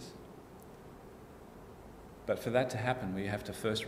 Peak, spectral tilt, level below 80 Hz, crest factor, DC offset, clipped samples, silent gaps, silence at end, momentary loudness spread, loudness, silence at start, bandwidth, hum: -16 dBFS; -5.5 dB/octave; -60 dBFS; 22 dB; under 0.1%; under 0.1%; none; 0 s; 21 LU; -35 LUFS; 0 s; 16 kHz; none